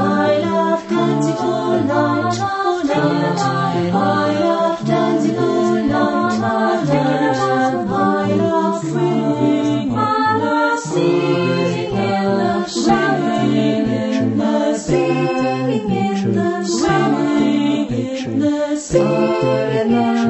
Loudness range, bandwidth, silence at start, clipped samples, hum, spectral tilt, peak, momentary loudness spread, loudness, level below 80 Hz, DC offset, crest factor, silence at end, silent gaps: 1 LU; 8.4 kHz; 0 s; under 0.1%; none; -6 dB/octave; -2 dBFS; 3 LU; -17 LUFS; -48 dBFS; under 0.1%; 14 dB; 0 s; none